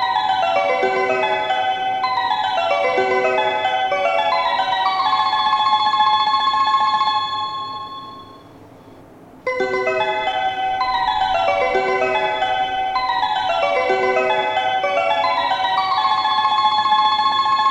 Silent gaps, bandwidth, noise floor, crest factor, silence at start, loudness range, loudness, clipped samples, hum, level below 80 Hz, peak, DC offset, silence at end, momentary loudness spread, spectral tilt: none; 10.5 kHz; -43 dBFS; 14 dB; 0 s; 5 LU; -18 LUFS; under 0.1%; none; -54 dBFS; -4 dBFS; under 0.1%; 0 s; 5 LU; -3 dB/octave